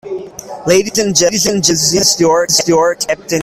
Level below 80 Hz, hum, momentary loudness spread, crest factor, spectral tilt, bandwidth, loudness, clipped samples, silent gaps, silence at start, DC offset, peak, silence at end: -46 dBFS; none; 12 LU; 12 dB; -2.5 dB/octave; 19 kHz; -11 LUFS; under 0.1%; none; 0.05 s; under 0.1%; 0 dBFS; 0 s